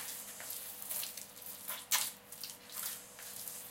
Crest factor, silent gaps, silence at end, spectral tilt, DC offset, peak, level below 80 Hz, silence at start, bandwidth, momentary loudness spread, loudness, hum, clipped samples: 28 dB; none; 0 s; 1 dB/octave; under 0.1%; -16 dBFS; -80 dBFS; 0 s; 17 kHz; 12 LU; -40 LUFS; 50 Hz at -70 dBFS; under 0.1%